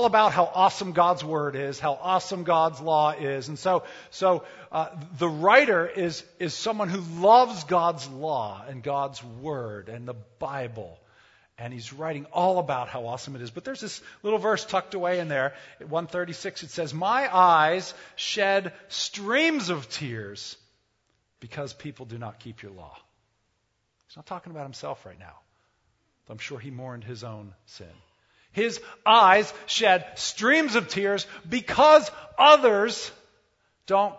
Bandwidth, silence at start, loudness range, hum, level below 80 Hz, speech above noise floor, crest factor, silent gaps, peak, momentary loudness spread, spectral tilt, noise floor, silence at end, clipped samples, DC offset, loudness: 8 kHz; 0 s; 21 LU; none; -66 dBFS; 49 dB; 24 dB; none; -2 dBFS; 21 LU; -4 dB/octave; -74 dBFS; 0 s; under 0.1%; under 0.1%; -24 LUFS